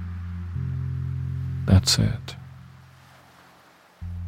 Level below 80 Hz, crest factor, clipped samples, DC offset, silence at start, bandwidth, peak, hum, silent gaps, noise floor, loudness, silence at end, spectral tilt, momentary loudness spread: -40 dBFS; 22 dB; under 0.1%; under 0.1%; 0 s; 16 kHz; -4 dBFS; none; none; -54 dBFS; -25 LUFS; 0 s; -4.5 dB/octave; 23 LU